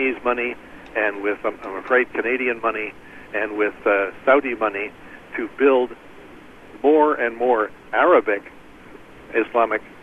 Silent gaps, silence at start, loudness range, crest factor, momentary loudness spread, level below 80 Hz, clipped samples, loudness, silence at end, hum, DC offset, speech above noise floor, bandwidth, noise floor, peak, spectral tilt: none; 0 s; 3 LU; 18 dB; 13 LU; -56 dBFS; under 0.1%; -21 LUFS; 0 s; none; under 0.1%; 22 dB; 6.4 kHz; -43 dBFS; -2 dBFS; -6 dB/octave